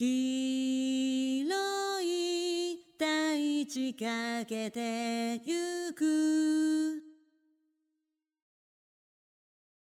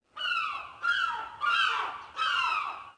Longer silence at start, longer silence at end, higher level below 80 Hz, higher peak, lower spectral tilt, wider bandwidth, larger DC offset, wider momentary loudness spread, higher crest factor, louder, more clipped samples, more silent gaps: second, 0 s vs 0.15 s; first, 2.85 s vs 0.05 s; second, -88 dBFS vs -70 dBFS; second, -18 dBFS vs -14 dBFS; first, -3 dB/octave vs 0.5 dB/octave; first, 15.5 kHz vs 10.5 kHz; neither; about the same, 7 LU vs 7 LU; about the same, 16 dB vs 16 dB; second, -32 LUFS vs -29 LUFS; neither; neither